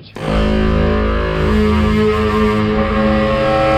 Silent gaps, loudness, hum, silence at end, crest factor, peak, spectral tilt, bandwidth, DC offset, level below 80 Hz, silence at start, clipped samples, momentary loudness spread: none; -15 LUFS; none; 0 s; 12 dB; -2 dBFS; -7.5 dB/octave; 9.8 kHz; under 0.1%; -22 dBFS; 0 s; under 0.1%; 3 LU